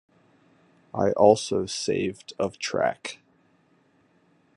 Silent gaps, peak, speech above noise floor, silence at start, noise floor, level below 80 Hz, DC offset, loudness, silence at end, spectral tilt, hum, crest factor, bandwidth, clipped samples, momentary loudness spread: none; -2 dBFS; 39 dB; 0.95 s; -63 dBFS; -60 dBFS; under 0.1%; -25 LUFS; 1.4 s; -4.5 dB/octave; none; 24 dB; 11 kHz; under 0.1%; 18 LU